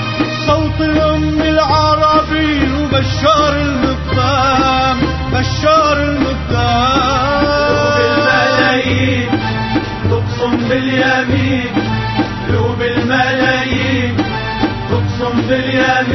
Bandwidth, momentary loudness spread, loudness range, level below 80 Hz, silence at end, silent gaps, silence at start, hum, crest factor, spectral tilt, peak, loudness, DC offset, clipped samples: 6.2 kHz; 6 LU; 3 LU; -28 dBFS; 0 s; none; 0 s; none; 14 dB; -6 dB/octave; 0 dBFS; -13 LUFS; under 0.1%; under 0.1%